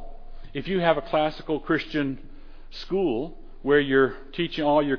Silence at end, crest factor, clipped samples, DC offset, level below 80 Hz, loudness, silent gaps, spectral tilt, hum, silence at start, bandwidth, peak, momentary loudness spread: 0 s; 18 dB; under 0.1%; under 0.1%; -42 dBFS; -25 LUFS; none; -7.5 dB/octave; none; 0 s; 5.4 kHz; -6 dBFS; 15 LU